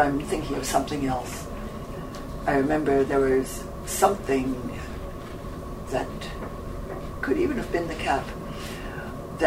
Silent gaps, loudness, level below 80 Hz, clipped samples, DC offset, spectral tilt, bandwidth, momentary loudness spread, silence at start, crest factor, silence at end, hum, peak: none; -28 LUFS; -40 dBFS; under 0.1%; under 0.1%; -5 dB/octave; 16 kHz; 14 LU; 0 s; 20 dB; 0 s; none; -6 dBFS